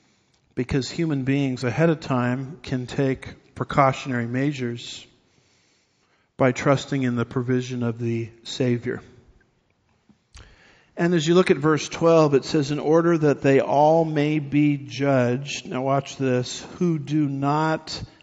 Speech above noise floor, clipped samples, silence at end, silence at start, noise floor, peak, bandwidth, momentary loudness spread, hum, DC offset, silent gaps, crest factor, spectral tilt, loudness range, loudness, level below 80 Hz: 44 dB; under 0.1%; 0.15 s; 0.55 s; -66 dBFS; -4 dBFS; 8 kHz; 12 LU; none; under 0.1%; none; 20 dB; -6 dB/octave; 7 LU; -22 LUFS; -54 dBFS